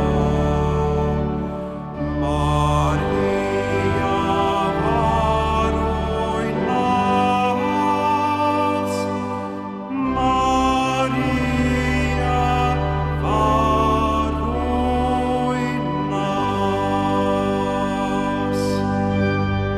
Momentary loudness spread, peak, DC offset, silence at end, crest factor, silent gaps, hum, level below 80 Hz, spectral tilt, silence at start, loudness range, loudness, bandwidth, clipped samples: 5 LU; -6 dBFS; under 0.1%; 0 s; 14 dB; none; none; -30 dBFS; -6.5 dB/octave; 0 s; 2 LU; -20 LUFS; 13.5 kHz; under 0.1%